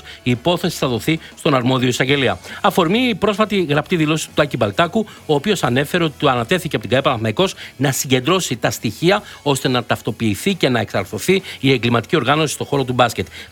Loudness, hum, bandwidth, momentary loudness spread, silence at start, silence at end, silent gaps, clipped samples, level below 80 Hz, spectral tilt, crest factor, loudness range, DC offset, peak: -18 LUFS; none; 19 kHz; 4 LU; 0.05 s; 0.05 s; none; under 0.1%; -48 dBFS; -5 dB/octave; 18 dB; 1 LU; under 0.1%; 0 dBFS